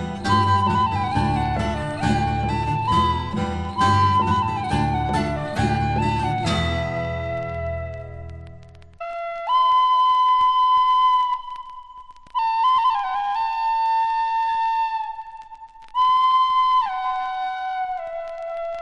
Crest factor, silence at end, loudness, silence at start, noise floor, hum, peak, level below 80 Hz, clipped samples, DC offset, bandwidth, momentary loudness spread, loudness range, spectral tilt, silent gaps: 14 dB; 0 s; -21 LUFS; 0 s; -43 dBFS; none; -6 dBFS; -40 dBFS; under 0.1%; under 0.1%; 11.5 kHz; 14 LU; 5 LU; -6 dB/octave; none